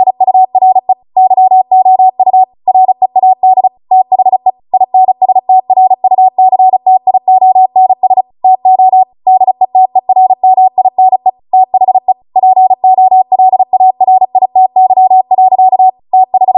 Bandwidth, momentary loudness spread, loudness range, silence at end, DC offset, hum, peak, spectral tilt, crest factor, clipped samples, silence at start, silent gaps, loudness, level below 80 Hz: 1.1 kHz; 3 LU; 1 LU; 0 s; under 0.1%; none; 0 dBFS; -10 dB/octave; 6 dB; under 0.1%; 0 s; none; -8 LUFS; -64 dBFS